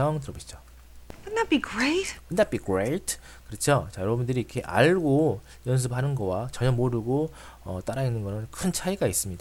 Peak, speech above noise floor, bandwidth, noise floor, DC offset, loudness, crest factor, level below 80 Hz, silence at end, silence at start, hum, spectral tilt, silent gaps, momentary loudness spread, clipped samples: -8 dBFS; 19 dB; 16.5 kHz; -46 dBFS; under 0.1%; -27 LUFS; 20 dB; -48 dBFS; 0 s; 0 s; none; -5.5 dB/octave; none; 12 LU; under 0.1%